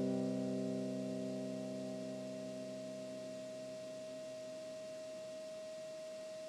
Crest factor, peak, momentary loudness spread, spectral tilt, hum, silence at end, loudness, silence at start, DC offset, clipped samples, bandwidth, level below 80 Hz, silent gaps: 16 dB; -28 dBFS; 8 LU; -6 dB/octave; none; 0 s; -44 LUFS; 0 s; under 0.1%; under 0.1%; 13.5 kHz; -88 dBFS; none